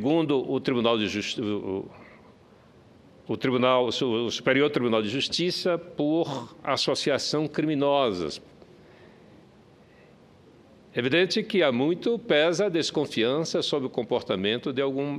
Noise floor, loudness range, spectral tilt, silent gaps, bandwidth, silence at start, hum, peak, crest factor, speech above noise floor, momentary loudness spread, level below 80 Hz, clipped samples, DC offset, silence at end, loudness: -54 dBFS; 5 LU; -4.5 dB/octave; none; 13 kHz; 0 s; none; -8 dBFS; 18 dB; 29 dB; 7 LU; -66 dBFS; under 0.1%; under 0.1%; 0 s; -26 LUFS